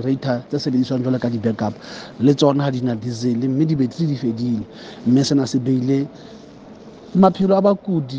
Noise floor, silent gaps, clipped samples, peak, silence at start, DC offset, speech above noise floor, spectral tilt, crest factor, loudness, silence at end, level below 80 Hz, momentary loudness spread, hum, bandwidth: -40 dBFS; none; under 0.1%; 0 dBFS; 0 s; under 0.1%; 22 dB; -7 dB/octave; 18 dB; -19 LUFS; 0 s; -56 dBFS; 10 LU; none; 8.6 kHz